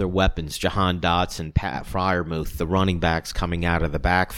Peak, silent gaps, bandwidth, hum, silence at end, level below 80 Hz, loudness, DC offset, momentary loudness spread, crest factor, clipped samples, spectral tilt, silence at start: -4 dBFS; none; 17 kHz; none; 0 s; -32 dBFS; -23 LUFS; under 0.1%; 5 LU; 18 dB; under 0.1%; -5.5 dB/octave; 0 s